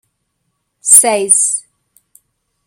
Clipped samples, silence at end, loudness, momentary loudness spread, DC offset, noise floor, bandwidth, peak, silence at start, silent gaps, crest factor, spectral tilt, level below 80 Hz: 0.7%; 1.05 s; -9 LUFS; 15 LU; under 0.1%; -69 dBFS; over 20 kHz; 0 dBFS; 0.85 s; none; 16 dB; -0.5 dB/octave; -66 dBFS